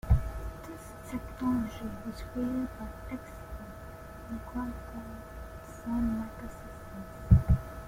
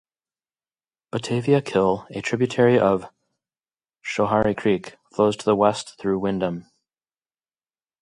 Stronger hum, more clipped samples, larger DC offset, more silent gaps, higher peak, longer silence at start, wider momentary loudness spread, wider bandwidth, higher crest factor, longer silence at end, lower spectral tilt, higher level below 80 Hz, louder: neither; neither; neither; neither; second, -8 dBFS vs -4 dBFS; second, 0.05 s vs 1.15 s; first, 16 LU vs 11 LU; first, 16.5 kHz vs 11.5 kHz; about the same, 24 dB vs 20 dB; second, 0 s vs 1.4 s; first, -8 dB/octave vs -6 dB/octave; first, -38 dBFS vs -56 dBFS; second, -34 LUFS vs -22 LUFS